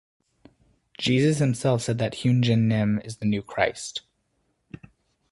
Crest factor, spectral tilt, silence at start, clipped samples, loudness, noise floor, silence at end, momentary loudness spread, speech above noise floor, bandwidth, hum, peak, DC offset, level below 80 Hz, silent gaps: 20 dB; -6 dB/octave; 1 s; under 0.1%; -24 LUFS; -72 dBFS; 1.3 s; 8 LU; 49 dB; 11.5 kHz; none; -4 dBFS; under 0.1%; -56 dBFS; none